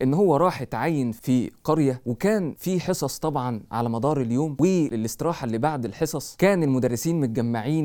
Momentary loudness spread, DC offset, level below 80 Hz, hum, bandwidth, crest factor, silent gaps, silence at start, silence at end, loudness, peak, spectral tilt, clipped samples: 7 LU; under 0.1%; -54 dBFS; none; 19 kHz; 16 dB; none; 0 s; 0 s; -24 LUFS; -6 dBFS; -6.5 dB/octave; under 0.1%